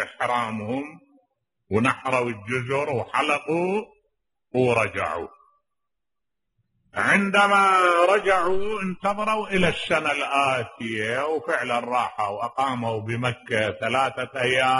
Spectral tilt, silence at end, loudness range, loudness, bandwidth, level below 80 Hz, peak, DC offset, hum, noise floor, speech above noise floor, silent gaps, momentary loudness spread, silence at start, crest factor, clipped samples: -5 dB/octave; 0 s; 6 LU; -23 LUFS; 11.5 kHz; -54 dBFS; -6 dBFS; under 0.1%; none; -87 dBFS; 64 dB; none; 10 LU; 0 s; 18 dB; under 0.1%